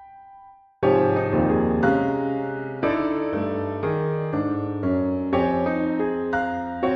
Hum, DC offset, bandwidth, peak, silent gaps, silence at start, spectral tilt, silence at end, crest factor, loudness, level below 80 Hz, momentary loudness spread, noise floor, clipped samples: none; under 0.1%; 6.2 kHz; -6 dBFS; none; 0 s; -9.5 dB/octave; 0 s; 16 dB; -23 LUFS; -48 dBFS; 6 LU; -49 dBFS; under 0.1%